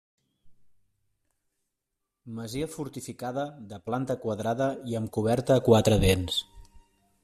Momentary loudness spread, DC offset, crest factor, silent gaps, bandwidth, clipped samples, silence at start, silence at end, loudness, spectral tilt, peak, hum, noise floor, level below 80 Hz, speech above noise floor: 16 LU; under 0.1%; 24 dB; none; 15 kHz; under 0.1%; 0.45 s; 0.45 s; -27 LUFS; -5.5 dB/octave; -6 dBFS; none; -84 dBFS; -46 dBFS; 57 dB